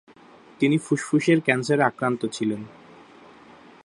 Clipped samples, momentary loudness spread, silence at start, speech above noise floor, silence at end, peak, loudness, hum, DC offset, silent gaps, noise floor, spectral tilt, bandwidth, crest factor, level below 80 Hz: under 0.1%; 8 LU; 0.6 s; 28 dB; 1.15 s; -4 dBFS; -23 LUFS; none; under 0.1%; none; -50 dBFS; -6 dB/octave; 11.5 kHz; 20 dB; -68 dBFS